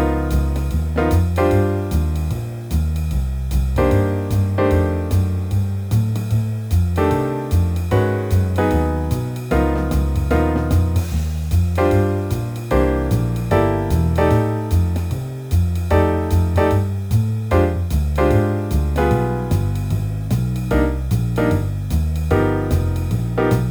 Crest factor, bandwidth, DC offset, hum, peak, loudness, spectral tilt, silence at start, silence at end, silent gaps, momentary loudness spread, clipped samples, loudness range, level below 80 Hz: 16 dB; over 20 kHz; under 0.1%; none; -2 dBFS; -19 LUFS; -8 dB/octave; 0 s; 0 s; none; 5 LU; under 0.1%; 2 LU; -24 dBFS